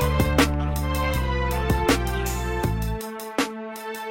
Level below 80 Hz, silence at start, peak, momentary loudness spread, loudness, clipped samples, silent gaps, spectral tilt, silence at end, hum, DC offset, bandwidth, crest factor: -28 dBFS; 0 s; -6 dBFS; 9 LU; -25 LUFS; under 0.1%; none; -5 dB/octave; 0 s; none; under 0.1%; 16.5 kHz; 18 dB